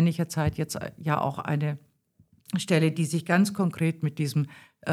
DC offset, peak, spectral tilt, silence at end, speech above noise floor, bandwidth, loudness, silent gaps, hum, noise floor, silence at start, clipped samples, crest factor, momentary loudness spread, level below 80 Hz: under 0.1%; -8 dBFS; -6 dB/octave; 0 s; 37 dB; 14 kHz; -27 LUFS; none; none; -63 dBFS; 0 s; under 0.1%; 20 dB; 9 LU; -56 dBFS